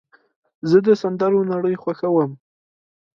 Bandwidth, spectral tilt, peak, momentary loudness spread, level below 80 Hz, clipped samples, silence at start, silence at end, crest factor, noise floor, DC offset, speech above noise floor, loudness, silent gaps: 7.2 kHz; -8.5 dB/octave; -4 dBFS; 9 LU; -66 dBFS; under 0.1%; 0.65 s; 0.8 s; 16 dB; under -90 dBFS; under 0.1%; over 72 dB; -19 LUFS; none